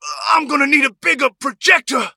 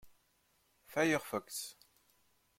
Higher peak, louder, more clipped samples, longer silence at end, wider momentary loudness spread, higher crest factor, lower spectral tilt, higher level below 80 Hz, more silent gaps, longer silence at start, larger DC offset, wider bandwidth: first, 0 dBFS vs -20 dBFS; first, -14 LUFS vs -36 LUFS; neither; second, 0.05 s vs 0.85 s; second, 5 LU vs 11 LU; second, 16 dB vs 22 dB; second, -1 dB/octave vs -4 dB/octave; first, -70 dBFS vs -78 dBFS; neither; about the same, 0.05 s vs 0.05 s; neither; about the same, 17 kHz vs 16.5 kHz